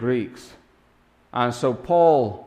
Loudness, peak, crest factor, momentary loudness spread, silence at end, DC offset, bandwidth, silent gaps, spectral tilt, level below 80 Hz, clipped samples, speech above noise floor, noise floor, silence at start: -21 LUFS; -6 dBFS; 18 dB; 14 LU; 0.05 s; under 0.1%; 12 kHz; none; -6.5 dB/octave; -58 dBFS; under 0.1%; 38 dB; -59 dBFS; 0 s